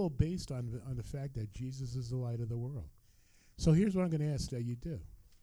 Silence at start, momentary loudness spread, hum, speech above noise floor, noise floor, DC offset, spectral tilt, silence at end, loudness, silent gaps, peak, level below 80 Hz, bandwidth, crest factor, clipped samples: 0 s; 13 LU; none; 29 dB; -65 dBFS; under 0.1%; -7.5 dB/octave; 0.2 s; -36 LUFS; none; -16 dBFS; -50 dBFS; 12 kHz; 20 dB; under 0.1%